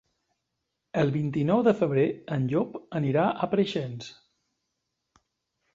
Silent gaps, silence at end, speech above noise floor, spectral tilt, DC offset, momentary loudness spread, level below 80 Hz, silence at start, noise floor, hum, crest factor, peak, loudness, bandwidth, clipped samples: none; 1.6 s; 56 dB; -8 dB/octave; under 0.1%; 10 LU; -66 dBFS; 0.95 s; -82 dBFS; none; 18 dB; -10 dBFS; -26 LUFS; 7.6 kHz; under 0.1%